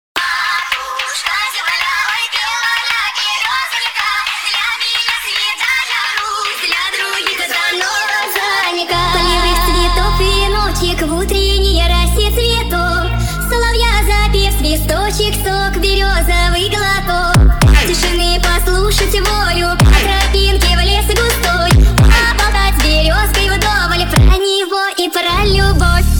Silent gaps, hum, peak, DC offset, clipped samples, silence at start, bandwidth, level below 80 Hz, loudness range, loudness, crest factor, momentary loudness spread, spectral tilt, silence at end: none; none; 0 dBFS; under 0.1%; under 0.1%; 0.15 s; 19.5 kHz; -16 dBFS; 3 LU; -13 LUFS; 12 dB; 5 LU; -3.5 dB/octave; 0 s